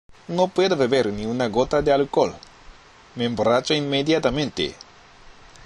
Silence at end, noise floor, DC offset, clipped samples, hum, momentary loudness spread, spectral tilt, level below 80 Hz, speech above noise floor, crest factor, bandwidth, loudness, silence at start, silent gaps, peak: 0.35 s; -47 dBFS; under 0.1%; under 0.1%; none; 8 LU; -5 dB/octave; -46 dBFS; 26 dB; 18 dB; 11 kHz; -22 LUFS; 0.1 s; none; -4 dBFS